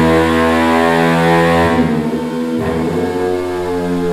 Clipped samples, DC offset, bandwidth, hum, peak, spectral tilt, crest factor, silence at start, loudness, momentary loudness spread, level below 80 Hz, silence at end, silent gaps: under 0.1%; under 0.1%; 15.5 kHz; none; 0 dBFS; -6.5 dB/octave; 14 dB; 0 s; -14 LUFS; 7 LU; -38 dBFS; 0 s; none